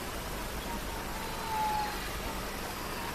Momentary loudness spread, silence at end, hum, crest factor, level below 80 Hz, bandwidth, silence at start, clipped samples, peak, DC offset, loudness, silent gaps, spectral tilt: 6 LU; 0 s; none; 14 dB; -44 dBFS; 16 kHz; 0 s; under 0.1%; -20 dBFS; under 0.1%; -36 LUFS; none; -3.5 dB/octave